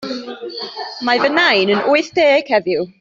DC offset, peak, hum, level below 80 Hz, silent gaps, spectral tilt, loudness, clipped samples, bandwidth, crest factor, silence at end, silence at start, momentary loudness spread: under 0.1%; -2 dBFS; none; -62 dBFS; none; -4.5 dB/octave; -14 LUFS; under 0.1%; 7.6 kHz; 14 dB; 0.1 s; 0 s; 14 LU